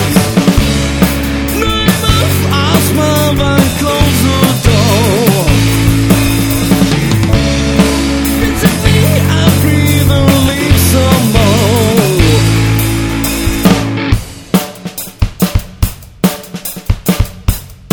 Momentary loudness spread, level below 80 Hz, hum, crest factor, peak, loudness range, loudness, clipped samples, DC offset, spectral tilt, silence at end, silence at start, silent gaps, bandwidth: 7 LU; -20 dBFS; none; 10 dB; 0 dBFS; 5 LU; -10 LUFS; 0.7%; under 0.1%; -5 dB/octave; 0 s; 0 s; none; over 20 kHz